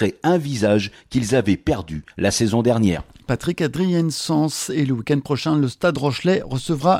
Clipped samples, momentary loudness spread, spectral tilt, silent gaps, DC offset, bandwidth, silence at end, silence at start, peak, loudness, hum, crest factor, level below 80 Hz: under 0.1%; 6 LU; -5.5 dB/octave; none; under 0.1%; 16 kHz; 0 s; 0 s; -4 dBFS; -20 LUFS; none; 16 dB; -46 dBFS